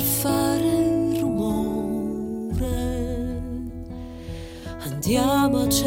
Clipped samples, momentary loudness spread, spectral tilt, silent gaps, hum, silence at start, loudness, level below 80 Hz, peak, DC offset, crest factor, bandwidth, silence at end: under 0.1%; 16 LU; -5 dB/octave; none; none; 0 s; -24 LUFS; -38 dBFS; -8 dBFS; under 0.1%; 16 dB; 17 kHz; 0 s